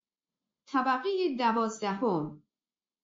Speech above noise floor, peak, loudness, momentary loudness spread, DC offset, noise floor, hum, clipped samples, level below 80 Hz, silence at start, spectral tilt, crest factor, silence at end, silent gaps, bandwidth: over 61 dB; -16 dBFS; -30 LUFS; 5 LU; under 0.1%; under -90 dBFS; none; under 0.1%; -80 dBFS; 0.7 s; -4 dB/octave; 16 dB; 0.65 s; none; 7.4 kHz